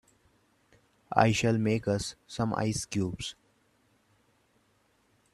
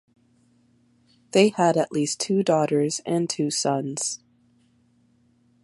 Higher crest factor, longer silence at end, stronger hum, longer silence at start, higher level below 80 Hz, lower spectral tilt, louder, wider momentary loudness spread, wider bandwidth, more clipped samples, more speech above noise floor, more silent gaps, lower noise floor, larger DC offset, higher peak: first, 26 dB vs 20 dB; first, 2 s vs 1.5 s; neither; second, 1.1 s vs 1.35 s; first, -58 dBFS vs -72 dBFS; about the same, -5.5 dB/octave vs -4.5 dB/octave; second, -29 LUFS vs -23 LUFS; first, 12 LU vs 8 LU; first, 13 kHz vs 11.5 kHz; neither; about the same, 41 dB vs 40 dB; neither; first, -69 dBFS vs -62 dBFS; neither; about the same, -6 dBFS vs -4 dBFS